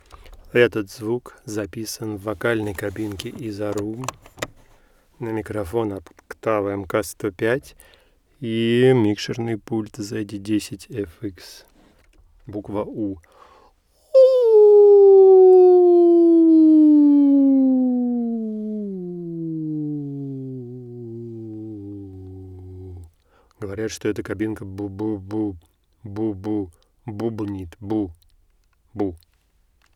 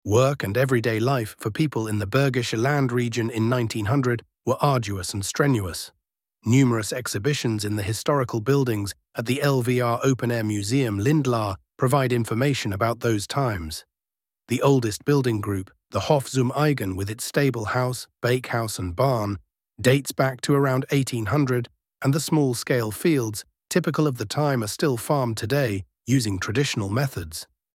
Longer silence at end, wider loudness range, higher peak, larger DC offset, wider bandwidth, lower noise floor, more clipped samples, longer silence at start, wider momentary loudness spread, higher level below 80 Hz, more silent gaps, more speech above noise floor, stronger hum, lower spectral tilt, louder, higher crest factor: first, 0.8 s vs 0.3 s; first, 19 LU vs 2 LU; about the same, -2 dBFS vs -4 dBFS; neither; second, 14.5 kHz vs 16.5 kHz; second, -62 dBFS vs under -90 dBFS; neither; first, 0.55 s vs 0.05 s; first, 22 LU vs 7 LU; about the same, -54 dBFS vs -54 dBFS; neither; second, 37 dB vs over 67 dB; neither; first, -7 dB/octave vs -5.5 dB/octave; first, -18 LUFS vs -24 LUFS; about the same, 18 dB vs 18 dB